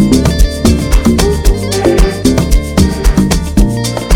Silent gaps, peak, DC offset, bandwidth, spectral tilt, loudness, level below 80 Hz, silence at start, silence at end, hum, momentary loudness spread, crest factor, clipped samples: none; 0 dBFS; under 0.1%; 17 kHz; -5.5 dB/octave; -11 LUFS; -12 dBFS; 0 s; 0 s; none; 3 LU; 10 dB; 0.8%